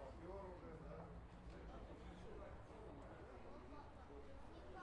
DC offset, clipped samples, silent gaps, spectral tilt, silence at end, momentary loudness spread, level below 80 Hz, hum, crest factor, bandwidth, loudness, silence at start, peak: under 0.1%; under 0.1%; none; -7 dB/octave; 0 s; 5 LU; -62 dBFS; none; 14 dB; 10.5 kHz; -58 LUFS; 0 s; -42 dBFS